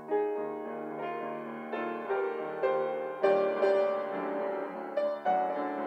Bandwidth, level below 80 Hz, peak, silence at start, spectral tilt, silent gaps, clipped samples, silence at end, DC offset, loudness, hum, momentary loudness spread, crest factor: 8.2 kHz; under -90 dBFS; -14 dBFS; 0 s; -7 dB/octave; none; under 0.1%; 0 s; under 0.1%; -32 LUFS; none; 10 LU; 18 dB